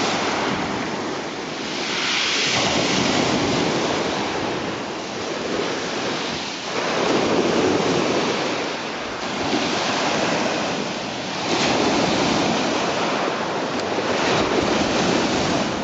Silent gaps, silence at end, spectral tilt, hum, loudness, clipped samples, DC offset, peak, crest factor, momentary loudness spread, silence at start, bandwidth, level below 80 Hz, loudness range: none; 0 s; -3.5 dB/octave; none; -21 LUFS; under 0.1%; under 0.1%; -6 dBFS; 14 dB; 7 LU; 0 s; 9 kHz; -50 dBFS; 3 LU